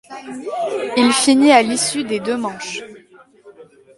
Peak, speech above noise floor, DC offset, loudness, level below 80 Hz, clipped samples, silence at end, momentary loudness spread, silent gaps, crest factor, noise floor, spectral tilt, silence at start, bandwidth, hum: 0 dBFS; 30 dB; under 0.1%; -16 LUFS; -62 dBFS; under 0.1%; 0.35 s; 17 LU; none; 18 dB; -47 dBFS; -2.5 dB/octave; 0.1 s; 11.5 kHz; none